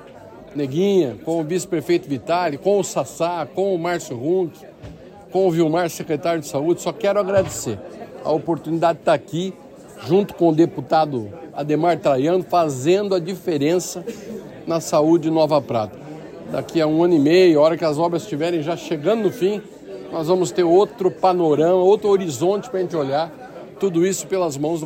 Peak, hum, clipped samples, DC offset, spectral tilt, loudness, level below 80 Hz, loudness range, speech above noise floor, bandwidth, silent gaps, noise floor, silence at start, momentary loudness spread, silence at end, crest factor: -4 dBFS; none; under 0.1%; under 0.1%; -6 dB/octave; -20 LUFS; -58 dBFS; 4 LU; 22 dB; 16 kHz; none; -41 dBFS; 0 s; 13 LU; 0 s; 16 dB